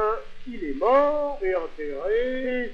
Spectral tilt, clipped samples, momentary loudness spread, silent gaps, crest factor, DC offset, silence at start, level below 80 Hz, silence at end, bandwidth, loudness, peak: -6 dB/octave; under 0.1%; 13 LU; none; 18 dB; under 0.1%; 0 s; -42 dBFS; 0 s; 7 kHz; -25 LUFS; -8 dBFS